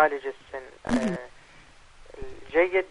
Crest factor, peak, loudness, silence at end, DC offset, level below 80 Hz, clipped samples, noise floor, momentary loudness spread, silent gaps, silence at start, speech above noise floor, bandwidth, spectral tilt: 20 dB; -8 dBFS; -27 LUFS; 0 s; under 0.1%; -50 dBFS; under 0.1%; -52 dBFS; 21 LU; none; 0 s; 27 dB; 10.5 kHz; -5.5 dB/octave